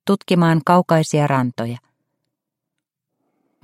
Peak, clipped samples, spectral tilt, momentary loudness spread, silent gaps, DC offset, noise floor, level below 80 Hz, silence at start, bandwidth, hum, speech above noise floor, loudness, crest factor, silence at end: 0 dBFS; under 0.1%; -6.5 dB/octave; 13 LU; none; under 0.1%; -81 dBFS; -62 dBFS; 0.05 s; 13 kHz; none; 64 dB; -17 LUFS; 18 dB; 1.85 s